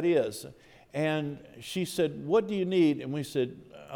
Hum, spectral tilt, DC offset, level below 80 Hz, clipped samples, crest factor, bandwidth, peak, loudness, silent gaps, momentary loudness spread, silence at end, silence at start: none; -6 dB/octave; under 0.1%; -68 dBFS; under 0.1%; 16 dB; 18 kHz; -14 dBFS; -30 LUFS; none; 16 LU; 0 s; 0 s